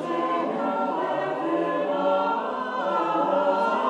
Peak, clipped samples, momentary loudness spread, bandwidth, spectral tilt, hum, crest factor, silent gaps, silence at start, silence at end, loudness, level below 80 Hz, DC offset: -12 dBFS; under 0.1%; 4 LU; 9.4 kHz; -6 dB/octave; none; 14 dB; none; 0 s; 0 s; -25 LUFS; -74 dBFS; under 0.1%